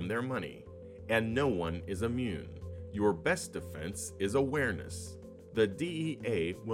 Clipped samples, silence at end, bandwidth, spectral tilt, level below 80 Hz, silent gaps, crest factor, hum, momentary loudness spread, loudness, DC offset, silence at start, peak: under 0.1%; 0 s; 16 kHz; -5.5 dB/octave; -60 dBFS; none; 18 dB; none; 14 LU; -34 LUFS; under 0.1%; 0 s; -16 dBFS